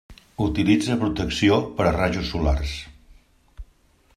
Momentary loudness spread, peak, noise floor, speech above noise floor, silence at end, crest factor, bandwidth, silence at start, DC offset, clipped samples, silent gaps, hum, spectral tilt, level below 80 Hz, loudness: 13 LU; -6 dBFS; -59 dBFS; 37 dB; 0.55 s; 18 dB; 13 kHz; 0.1 s; under 0.1%; under 0.1%; none; none; -6 dB/octave; -34 dBFS; -22 LUFS